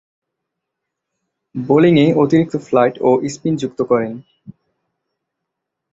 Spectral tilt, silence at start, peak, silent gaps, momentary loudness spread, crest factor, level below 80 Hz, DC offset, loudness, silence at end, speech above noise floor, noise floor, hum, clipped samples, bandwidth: -7 dB/octave; 1.55 s; -2 dBFS; none; 15 LU; 16 dB; -56 dBFS; under 0.1%; -15 LUFS; 1.4 s; 64 dB; -79 dBFS; none; under 0.1%; 8 kHz